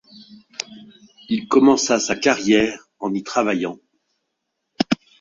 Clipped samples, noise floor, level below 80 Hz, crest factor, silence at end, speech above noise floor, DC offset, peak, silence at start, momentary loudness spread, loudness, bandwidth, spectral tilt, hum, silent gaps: under 0.1%; -77 dBFS; -58 dBFS; 20 dB; 0.25 s; 59 dB; under 0.1%; -2 dBFS; 0.3 s; 17 LU; -19 LUFS; 7.6 kHz; -3.5 dB/octave; none; none